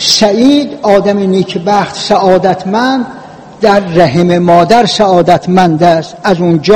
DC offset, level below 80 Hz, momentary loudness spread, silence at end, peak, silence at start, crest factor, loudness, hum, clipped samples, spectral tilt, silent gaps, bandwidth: 0.7%; -42 dBFS; 5 LU; 0 s; 0 dBFS; 0 s; 8 dB; -9 LUFS; none; 4%; -5 dB/octave; none; 16.5 kHz